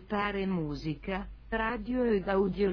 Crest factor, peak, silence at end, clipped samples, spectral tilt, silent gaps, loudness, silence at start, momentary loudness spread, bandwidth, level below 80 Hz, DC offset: 14 dB; -18 dBFS; 0 s; under 0.1%; -8 dB/octave; none; -32 LUFS; 0 s; 9 LU; 5.4 kHz; -46 dBFS; under 0.1%